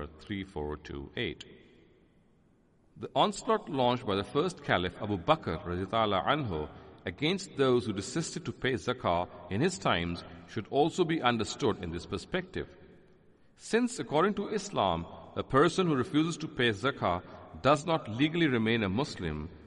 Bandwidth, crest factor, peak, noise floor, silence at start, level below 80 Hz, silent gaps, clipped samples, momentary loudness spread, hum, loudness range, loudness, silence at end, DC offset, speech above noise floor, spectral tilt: 11.5 kHz; 22 dB; -10 dBFS; -65 dBFS; 0 s; -58 dBFS; none; under 0.1%; 12 LU; none; 4 LU; -31 LUFS; 0.05 s; under 0.1%; 35 dB; -5.5 dB/octave